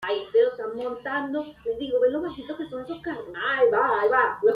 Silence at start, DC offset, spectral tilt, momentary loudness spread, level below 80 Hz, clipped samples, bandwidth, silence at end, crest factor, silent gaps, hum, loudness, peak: 0 s; under 0.1%; -6 dB/octave; 13 LU; -60 dBFS; under 0.1%; 5 kHz; 0 s; 16 dB; none; none; -25 LUFS; -8 dBFS